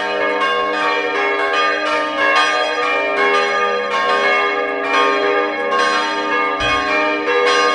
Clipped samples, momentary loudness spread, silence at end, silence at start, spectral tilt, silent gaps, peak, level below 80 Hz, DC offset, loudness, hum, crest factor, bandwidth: under 0.1%; 3 LU; 0 s; 0 s; -2 dB/octave; none; 0 dBFS; -50 dBFS; under 0.1%; -16 LUFS; none; 16 dB; 11 kHz